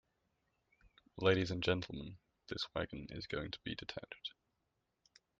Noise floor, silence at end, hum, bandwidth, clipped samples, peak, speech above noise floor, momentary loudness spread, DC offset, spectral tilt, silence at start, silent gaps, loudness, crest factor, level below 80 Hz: -85 dBFS; 1.1 s; none; 7.8 kHz; under 0.1%; -18 dBFS; 46 dB; 15 LU; under 0.1%; -6 dB/octave; 0.85 s; none; -40 LUFS; 24 dB; -64 dBFS